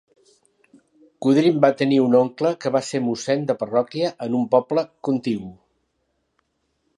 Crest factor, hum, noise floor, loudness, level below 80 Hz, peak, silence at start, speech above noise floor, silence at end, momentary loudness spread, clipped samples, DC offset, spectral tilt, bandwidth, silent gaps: 20 dB; none; -72 dBFS; -21 LUFS; -68 dBFS; -2 dBFS; 1.2 s; 52 dB; 1.45 s; 8 LU; under 0.1%; under 0.1%; -6.5 dB/octave; 11 kHz; none